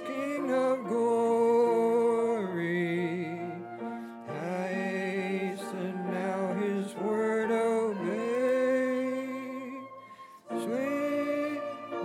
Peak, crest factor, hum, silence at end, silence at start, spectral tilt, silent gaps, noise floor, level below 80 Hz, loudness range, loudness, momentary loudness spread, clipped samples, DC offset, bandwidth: -16 dBFS; 14 dB; none; 0 s; 0 s; -6.5 dB/octave; none; -50 dBFS; -88 dBFS; 6 LU; -30 LUFS; 13 LU; under 0.1%; under 0.1%; 14 kHz